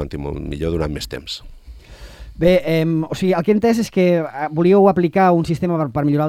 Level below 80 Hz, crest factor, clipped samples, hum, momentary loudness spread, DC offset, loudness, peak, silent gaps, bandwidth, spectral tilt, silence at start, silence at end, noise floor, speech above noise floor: -38 dBFS; 16 dB; under 0.1%; none; 13 LU; under 0.1%; -17 LUFS; -2 dBFS; none; 15 kHz; -7 dB/octave; 0 s; 0 s; -38 dBFS; 21 dB